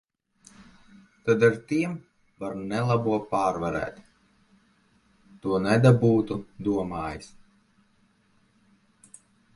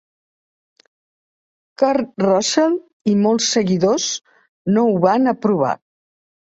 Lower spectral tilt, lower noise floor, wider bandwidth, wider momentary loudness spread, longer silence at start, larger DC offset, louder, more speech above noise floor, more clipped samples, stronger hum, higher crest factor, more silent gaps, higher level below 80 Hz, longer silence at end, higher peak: first, -7.5 dB/octave vs -4.5 dB/octave; second, -65 dBFS vs under -90 dBFS; first, 11.5 kHz vs 8 kHz; first, 16 LU vs 7 LU; second, 0.6 s vs 1.8 s; neither; second, -25 LUFS vs -17 LUFS; second, 41 dB vs over 74 dB; neither; neither; first, 22 dB vs 16 dB; second, none vs 2.93-3.00 s, 4.49-4.65 s; first, -56 dBFS vs -62 dBFS; first, 2.3 s vs 0.7 s; second, -6 dBFS vs -2 dBFS